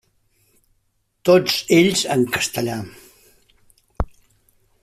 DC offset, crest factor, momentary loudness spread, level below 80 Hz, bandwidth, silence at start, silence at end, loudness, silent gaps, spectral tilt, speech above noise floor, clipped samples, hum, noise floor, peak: under 0.1%; 18 dB; 15 LU; -40 dBFS; 15.5 kHz; 1.25 s; 0.8 s; -19 LUFS; none; -4 dB/octave; 50 dB; under 0.1%; none; -68 dBFS; -2 dBFS